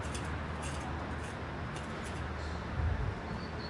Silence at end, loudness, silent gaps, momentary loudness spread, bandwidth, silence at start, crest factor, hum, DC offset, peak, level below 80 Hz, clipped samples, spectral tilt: 0 s; -39 LUFS; none; 5 LU; 11.5 kHz; 0 s; 16 dB; none; under 0.1%; -22 dBFS; -44 dBFS; under 0.1%; -5.5 dB/octave